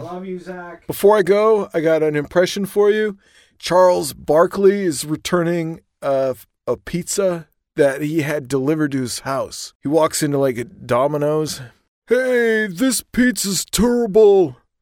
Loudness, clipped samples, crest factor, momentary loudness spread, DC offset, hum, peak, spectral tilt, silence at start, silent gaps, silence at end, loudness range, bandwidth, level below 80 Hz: -18 LUFS; under 0.1%; 16 dB; 14 LU; under 0.1%; none; -2 dBFS; -4.5 dB/octave; 0 s; 9.75-9.80 s, 11.88-12.02 s; 0.3 s; 4 LU; 18 kHz; -46 dBFS